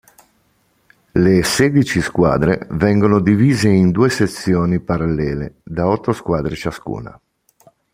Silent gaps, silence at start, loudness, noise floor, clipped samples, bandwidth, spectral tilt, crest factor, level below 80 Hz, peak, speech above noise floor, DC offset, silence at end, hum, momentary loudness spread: none; 1.15 s; -16 LUFS; -60 dBFS; under 0.1%; 16 kHz; -6.5 dB/octave; 16 dB; -40 dBFS; 0 dBFS; 45 dB; under 0.1%; 0.85 s; none; 12 LU